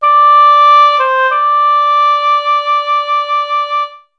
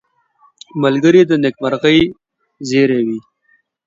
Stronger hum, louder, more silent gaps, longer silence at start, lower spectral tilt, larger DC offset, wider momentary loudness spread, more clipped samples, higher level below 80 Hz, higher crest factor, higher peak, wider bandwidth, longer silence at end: neither; first, -9 LUFS vs -14 LUFS; neither; second, 0 s vs 0.75 s; second, 2.5 dB/octave vs -6 dB/octave; neither; second, 9 LU vs 14 LU; neither; second, -68 dBFS vs -50 dBFS; second, 10 dB vs 16 dB; about the same, 0 dBFS vs 0 dBFS; second, 6.2 kHz vs 7.8 kHz; second, 0.2 s vs 0.65 s